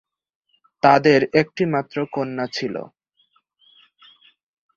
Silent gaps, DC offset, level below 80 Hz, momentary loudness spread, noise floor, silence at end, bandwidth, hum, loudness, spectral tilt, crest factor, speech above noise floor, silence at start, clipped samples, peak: none; under 0.1%; -62 dBFS; 12 LU; -64 dBFS; 1.9 s; 7.4 kHz; none; -19 LUFS; -6.5 dB/octave; 20 dB; 46 dB; 0.85 s; under 0.1%; -2 dBFS